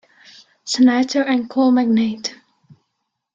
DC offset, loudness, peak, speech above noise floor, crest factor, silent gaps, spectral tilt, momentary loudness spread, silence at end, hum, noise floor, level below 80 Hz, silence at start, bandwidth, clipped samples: under 0.1%; -17 LUFS; -4 dBFS; 59 dB; 14 dB; none; -4 dB/octave; 13 LU; 1 s; none; -75 dBFS; -66 dBFS; 0.65 s; 7.8 kHz; under 0.1%